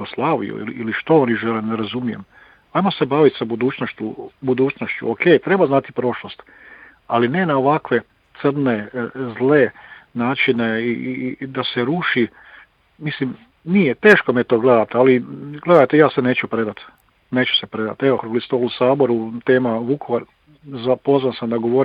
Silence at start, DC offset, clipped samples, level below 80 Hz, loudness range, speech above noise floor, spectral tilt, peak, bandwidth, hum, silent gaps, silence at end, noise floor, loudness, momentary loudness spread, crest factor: 0 s; under 0.1%; under 0.1%; -60 dBFS; 5 LU; 29 dB; -8 dB/octave; 0 dBFS; 6.4 kHz; none; none; 0 s; -47 dBFS; -18 LUFS; 12 LU; 18 dB